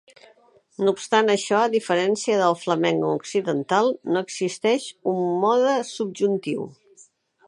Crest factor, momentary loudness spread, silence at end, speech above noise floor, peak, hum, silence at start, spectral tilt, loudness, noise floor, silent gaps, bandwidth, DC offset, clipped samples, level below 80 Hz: 18 dB; 7 LU; 0.75 s; 34 dB; -4 dBFS; none; 0.8 s; -4.5 dB/octave; -22 LUFS; -56 dBFS; none; 11.5 kHz; under 0.1%; under 0.1%; -74 dBFS